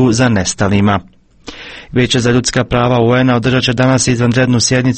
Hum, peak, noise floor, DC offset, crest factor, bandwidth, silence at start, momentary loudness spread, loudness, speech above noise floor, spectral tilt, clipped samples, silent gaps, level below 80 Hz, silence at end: none; 0 dBFS; -34 dBFS; under 0.1%; 12 dB; 8.8 kHz; 0 s; 8 LU; -12 LUFS; 22 dB; -5 dB/octave; under 0.1%; none; -36 dBFS; 0 s